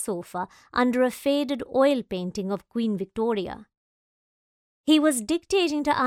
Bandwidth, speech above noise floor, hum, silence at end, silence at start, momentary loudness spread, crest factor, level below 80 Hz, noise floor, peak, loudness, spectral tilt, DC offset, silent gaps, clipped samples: 16 kHz; over 66 dB; none; 0 s; 0 s; 11 LU; 18 dB; -58 dBFS; under -90 dBFS; -8 dBFS; -25 LUFS; -4.5 dB/octave; under 0.1%; 3.77-4.84 s; under 0.1%